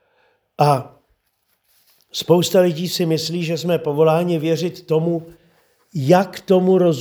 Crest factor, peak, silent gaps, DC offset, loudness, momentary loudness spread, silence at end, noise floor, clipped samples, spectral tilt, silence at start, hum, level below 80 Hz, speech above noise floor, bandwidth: 18 dB; 0 dBFS; none; under 0.1%; -18 LUFS; 8 LU; 0 s; -68 dBFS; under 0.1%; -6 dB/octave; 0.6 s; none; -66 dBFS; 51 dB; over 20 kHz